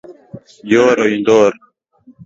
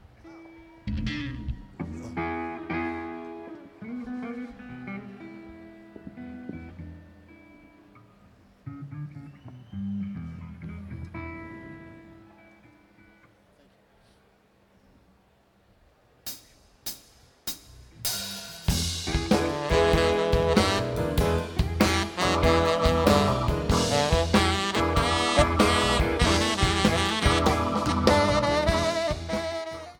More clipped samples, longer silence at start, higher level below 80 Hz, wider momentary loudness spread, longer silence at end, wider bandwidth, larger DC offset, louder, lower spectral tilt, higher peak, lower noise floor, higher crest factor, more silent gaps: neither; second, 0.1 s vs 0.25 s; second, -56 dBFS vs -36 dBFS; second, 5 LU vs 21 LU; first, 0.7 s vs 0.05 s; second, 7.8 kHz vs 19 kHz; neither; first, -13 LUFS vs -25 LUFS; about the same, -5 dB/octave vs -4.5 dB/octave; about the same, 0 dBFS vs -2 dBFS; second, -48 dBFS vs -62 dBFS; second, 16 dB vs 26 dB; neither